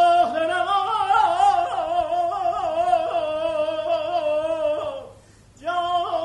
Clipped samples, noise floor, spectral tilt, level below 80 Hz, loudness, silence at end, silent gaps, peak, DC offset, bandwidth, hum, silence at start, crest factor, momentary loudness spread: under 0.1%; -50 dBFS; -4 dB/octave; -56 dBFS; -22 LUFS; 0 s; none; -6 dBFS; under 0.1%; 10.5 kHz; none; 0 s; 16 dB; 7 LU